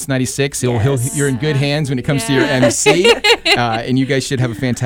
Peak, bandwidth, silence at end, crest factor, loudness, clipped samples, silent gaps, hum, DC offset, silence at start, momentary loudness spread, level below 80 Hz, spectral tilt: -2 dBFS; 17.5 kHz; 0 s; 12 dB; -14 LUFS; under 0.1%; none; none; under 0.1%; 0 s; 7 LU; -42 dBFS; -4.5 dB/octave